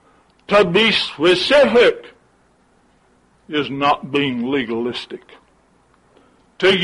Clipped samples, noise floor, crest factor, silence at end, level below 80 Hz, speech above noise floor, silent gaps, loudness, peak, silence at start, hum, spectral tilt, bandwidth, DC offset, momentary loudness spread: under 0.1%; -57 dBFS; 16 dB; 0 s; -54 dBFS; 40 dB; none; -16 LUFS; -4 dBFS; 0.5 s; none; -5 dB/octave; 11.5 kHz; under 0.1%; 13 LU